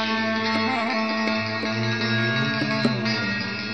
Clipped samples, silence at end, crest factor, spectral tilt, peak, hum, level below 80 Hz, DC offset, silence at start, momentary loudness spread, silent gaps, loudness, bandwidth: under 0.1%; 0 s; 16 dB; -5.5 dB/octave; -8 dBFS; none; -60 dBFS; 0.3%; 0 s; 3 LU; none; -23 LUFS; 8.8 kHz